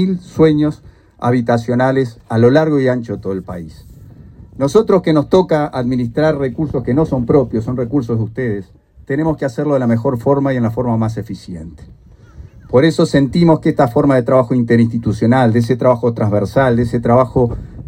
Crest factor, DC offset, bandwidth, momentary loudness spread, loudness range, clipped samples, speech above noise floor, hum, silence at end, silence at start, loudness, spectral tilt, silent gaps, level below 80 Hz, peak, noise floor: 14 dB; under 0.1%; 15 kHz; 10 LU; 4 LU; under 0.1%; 24 dB; none; 0 s; 0 s; -15 LUFS; -8 dB/octave; none; -40 dBFS; 0 dBFS; -38 dBFS